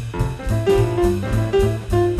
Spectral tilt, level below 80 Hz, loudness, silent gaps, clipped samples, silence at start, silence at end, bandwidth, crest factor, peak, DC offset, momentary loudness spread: -7.5 dB/octave; -28 dBFS; -19 LUFS; none; under 0.1%; 0 s; 0 s; 14.5 kHz; 14 dB; -4 dBFS; under 0.1%; 6 LU